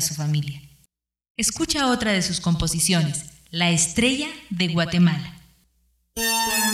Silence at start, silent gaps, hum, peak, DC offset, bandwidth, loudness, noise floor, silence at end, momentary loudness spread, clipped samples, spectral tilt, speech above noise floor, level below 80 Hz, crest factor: 0 s; 1.30-1.35 s; none; -6 dBFS; under 0.1%; 16.5 kHz; -22 LUFS; -66 dBFS; 0 s; 12 LU; under 0.1%; -3.5 dB/octave; 44 dB; -46 dBFS; 16 dB